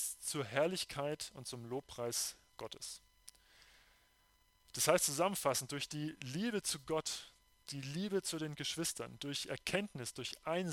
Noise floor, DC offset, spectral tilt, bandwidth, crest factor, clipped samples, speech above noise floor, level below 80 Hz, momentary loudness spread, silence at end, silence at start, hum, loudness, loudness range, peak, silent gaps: -72 dBFS; under 0.1%; -3 dB/octave; 17 kHz; 28 dB; under 0.1%; 33 dB; -70 dBFS; 13 LU; 0 s; 0 s; none; -39 LUFS; 7 LU; -14 dBFS; none